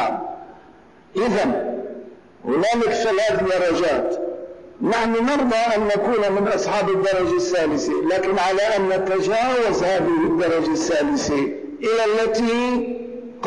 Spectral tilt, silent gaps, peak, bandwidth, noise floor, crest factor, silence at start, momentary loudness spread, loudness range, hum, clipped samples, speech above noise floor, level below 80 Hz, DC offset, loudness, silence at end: -4.5 dB/octave; none; -14 dBFS; 10.5 kHz; -48 dBFS; 6 dB; 0 s; 10 LU; 2 LU; none; under 0.1%; 29 dB; -50 dBFS; under 0.1%; -20 LUFS; 0 s